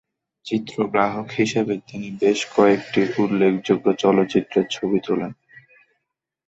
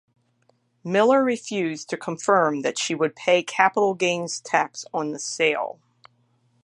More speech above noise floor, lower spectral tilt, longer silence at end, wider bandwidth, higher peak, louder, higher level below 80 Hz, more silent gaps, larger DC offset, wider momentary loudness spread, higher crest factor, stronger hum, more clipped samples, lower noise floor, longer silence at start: first, 59 dB vs 43 dB; first, -5.5 dB/octave vs -3.5 dB/octave; about the same, 0.9 s vs 0.9 s; second, 8 kHz vs 11 kHz; about the same, -4 dBFS vs -2 dBFS; about the same, -21 LUFS vs -23 LUFS; first, -60 dBFS vs -78 dBFS; neither; neither; about the same, 9 LU vs 10 LU; about the same, 18 dB vs 22 dB; neither; neither; first, -79 dBFS vs -66 dBFS; second, 0.45 s vs 0.85 s